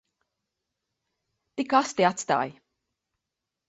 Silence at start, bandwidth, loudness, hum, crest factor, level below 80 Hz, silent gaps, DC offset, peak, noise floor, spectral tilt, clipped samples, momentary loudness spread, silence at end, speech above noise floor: 1.55 s; 8.2 kHz; -25 LUFS; none; 24 dB; -72 dBFS; none; under 0.1%; -6 dBFS; -86 dBFS; -4 dB/octave; under 0.1%; 12 LU; 1.15 s; 61 dB